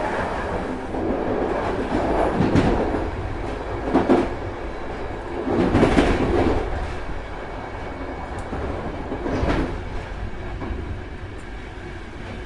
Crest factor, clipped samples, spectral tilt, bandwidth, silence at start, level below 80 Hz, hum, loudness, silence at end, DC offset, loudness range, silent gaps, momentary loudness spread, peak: 20 dB; under 0.1%; -7 dB/octave; 11.5 kHz; 0 s; -32 dBFS; none; -24 LUFS; 0 s; under 0.1%; 7 LU; none; 14 LU; -2 dBFS